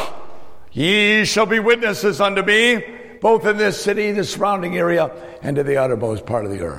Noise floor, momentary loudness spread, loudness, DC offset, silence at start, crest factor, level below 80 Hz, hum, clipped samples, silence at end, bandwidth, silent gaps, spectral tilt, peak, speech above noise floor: -38 dBFS; 10 LU; -17 LUFS; under 0.1%; 0 s; 16 dB; -50 dBFS; none; under 0.1%; 0 s; 16.5 kHz; none; -4 dB/octave; -2 dBFS; 21 dB